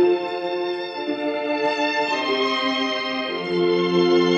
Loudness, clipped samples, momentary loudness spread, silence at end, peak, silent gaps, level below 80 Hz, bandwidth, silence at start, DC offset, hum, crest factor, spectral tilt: -22 LUFS; under 0.1%; 7 LU; 0 s; -6 dBFS; none; -72 dBFS; 7.8 kHz; 0 s; under 0.1%; none; 14 dB; -5 dB/octave